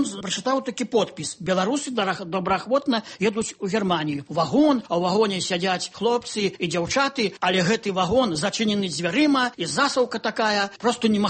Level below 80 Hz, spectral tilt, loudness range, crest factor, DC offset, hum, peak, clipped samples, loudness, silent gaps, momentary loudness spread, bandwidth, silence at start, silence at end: -56 dBFS; -4 dB/octave; 2 LU; 16 dB; under 0.1%; none; -8 dBFS; under 0.1%; -23 LUFS; none; 5 LU; 8.8 kHz; 0 s; 0 s